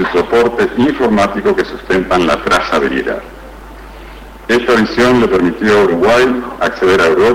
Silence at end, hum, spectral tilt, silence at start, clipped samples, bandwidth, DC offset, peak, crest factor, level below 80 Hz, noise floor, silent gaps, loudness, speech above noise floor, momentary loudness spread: 0 s; none; -5.5 dB/octave; 0 s; under 0.1%; 16 kHz; under 0.1%; -4 dBFS; 8 dB; -36 dBFS; -31 dBFS; none; -12 LUFS; 20 dB; 8 LU